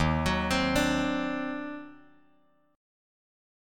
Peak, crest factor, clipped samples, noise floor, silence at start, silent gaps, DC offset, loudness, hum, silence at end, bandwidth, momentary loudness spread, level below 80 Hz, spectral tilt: -12 dBFS; 18 dB; under 0.1%; -67 dBFS; 0 s; none; under 0.1%; -28 LUFS; none; 1 s; 17.5 kHz; 15 LU; -44 dBFS; -5 dB/octave